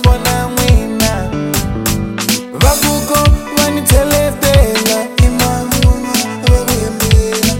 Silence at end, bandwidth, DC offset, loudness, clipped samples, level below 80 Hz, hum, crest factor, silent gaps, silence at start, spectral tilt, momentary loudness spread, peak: 0 s; 17 kHz; under 0.1%; -12 LUFS; 0.3%; -16 dBFS; none; 12 dB; none; 0 s; -4.5 dB/octave; 6 LU; 0 dBFS